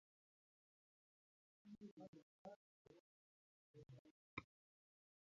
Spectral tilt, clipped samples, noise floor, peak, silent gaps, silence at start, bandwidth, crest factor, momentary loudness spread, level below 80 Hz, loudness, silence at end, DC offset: -5 dB/octave; under 0.1%; under -90 dBFS; -36 dBFS; 1.91-1.97 s, 2.08-2.13 s, 2.22-2.45 s, 2.56-2.85 s, 3.00-3.74 s, 3.99-4.05 s, 4.11-4.37 s; 1.65 s; 7.2 kHz; 30 dB; 10 LU; -86 dBFS; -62 LUFS; 0.85 s; under 0.1%